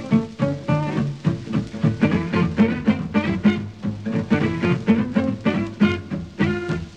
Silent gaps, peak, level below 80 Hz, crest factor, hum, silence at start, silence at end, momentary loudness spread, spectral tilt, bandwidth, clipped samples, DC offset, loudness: none; -6 dBFS; -46 dBFS; 16 dB; none; 0 s; 0 s; 7 LU; -8 dB/octave; 8.4 kHz; under 0.1%; 0.2%; -22 LUFS